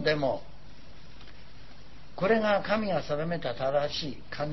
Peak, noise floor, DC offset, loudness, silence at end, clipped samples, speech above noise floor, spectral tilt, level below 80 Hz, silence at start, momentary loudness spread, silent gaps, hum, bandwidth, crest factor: -12 dBFS; -51 dBFS; 1%; -29 LUFS; 0 s; under 0.1%; 22 dB; -6 dB/octave; -54 dBFS; 0 s; 25 LU; none; none; 6.2 kHz; 18 dB